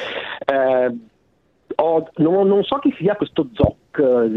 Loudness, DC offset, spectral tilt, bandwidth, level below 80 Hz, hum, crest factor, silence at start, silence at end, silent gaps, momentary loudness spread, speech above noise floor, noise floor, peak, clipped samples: -19 LUFS; under 0.1%; -9 dB/octave; 5.8 kHz; -44 dBFS; none; 18 dB; 0 s; 0 s; none; 8 LU; 44 dB; -61 dBFS; -2 dBFS; under 0.1%